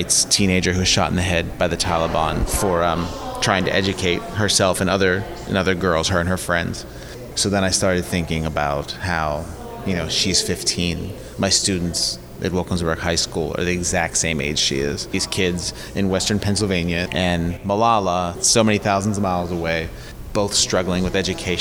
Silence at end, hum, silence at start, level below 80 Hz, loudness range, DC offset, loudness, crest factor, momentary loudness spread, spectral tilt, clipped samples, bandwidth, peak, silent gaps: 0 s; none; 0 s; -36 dBFS; 2 LU; 0.1%; -20 LUFS; 18 dB; 8 LU; -3.5 dB/octave; under 0.1%; over 20 kHz; -2 dBFS; none